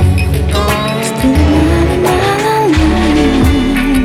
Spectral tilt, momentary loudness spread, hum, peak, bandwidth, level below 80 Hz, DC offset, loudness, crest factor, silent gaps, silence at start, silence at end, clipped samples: -6 dB/octave; 3 LU; none; 0 dBFS; 16 kHz; -18 dBFS; under 0.1%; -11 LUFS; 10 dB; none; 0 s; 0 s; under 0.1%